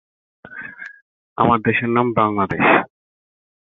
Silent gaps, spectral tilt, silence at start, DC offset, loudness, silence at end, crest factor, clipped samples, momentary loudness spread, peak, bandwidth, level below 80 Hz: 1.02-1.36 s; -9 dB/octave; 0.5 s; under 0.1%; -17 LUFS; 0.85 s; 18 dB; under 0.1%; 22 LU; -2 dBFS; 4.2 kHz; -52 dBFS